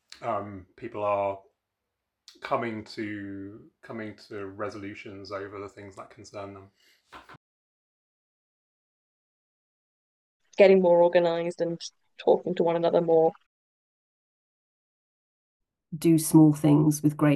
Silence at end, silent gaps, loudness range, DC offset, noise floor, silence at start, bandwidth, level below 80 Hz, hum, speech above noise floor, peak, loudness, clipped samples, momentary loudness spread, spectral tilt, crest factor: 0 s; 7.37-10.40 s, 13.46-15.60 s; 18 LU; under 0.1%; -84 dBFS; 0.2 s; 12.5 kHz; -72 dBFS; none; 59 dB; -4 dBFS; -24 LUFS; under 0.1%; 23 LU; -6.5 dB/octave; 22 dB